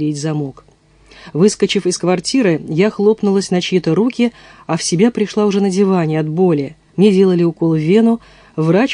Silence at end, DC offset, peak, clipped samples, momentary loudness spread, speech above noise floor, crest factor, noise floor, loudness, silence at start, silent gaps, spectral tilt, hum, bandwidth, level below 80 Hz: 0 s; under 0.1%; 0 dBFS; under 0.1%; 9 LU; 32 dB; 14 dB; -46 dBFS; -15 LUFS; 0 s; none; -6 dB/octave; none; 10.5 kHz; -54 dBFS